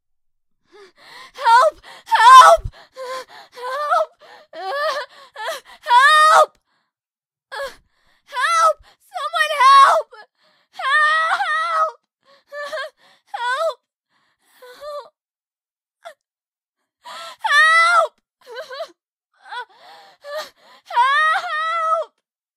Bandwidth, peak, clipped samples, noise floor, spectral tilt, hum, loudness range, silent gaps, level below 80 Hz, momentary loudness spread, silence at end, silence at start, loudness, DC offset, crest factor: 15.5 kHz; 0 dBFS; under 0.1%; under -90 dBFS; 0 dB/octave; none; 15 LU; 15.70-15.75 s, 16.48-16.52 s, 16.69-16.73 s, 19.12-19.17 s; -52 dBFS; 24 LU; 0.5 s; 1.15 s; -14 LUFS; under 0.1%; 18 dB